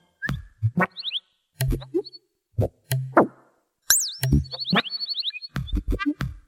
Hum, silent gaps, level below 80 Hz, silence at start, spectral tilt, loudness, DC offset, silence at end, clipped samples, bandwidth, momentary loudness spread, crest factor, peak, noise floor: none; none; -36 dBFS; 0.2 s; -3.5 dB/octave; -25 LUFS; under 0.1%; 0.1 s; under 0.1%; 17 kHz; 11 LU; 24 dB; -2 dBFS; -62 dBFS